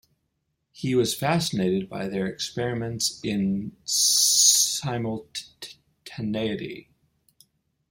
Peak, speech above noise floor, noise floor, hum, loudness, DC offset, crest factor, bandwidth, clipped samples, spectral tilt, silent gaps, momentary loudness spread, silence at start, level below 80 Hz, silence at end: -4 dBFS; 51 dB; -76 dBFS; none; -23 LUFS; under 0.1%; 22 dB; 16.5 kHz; under 0.1%; -2.5 dB/octave; none; 20 LU; 0.75 s; -60 dBFS; 1.1 s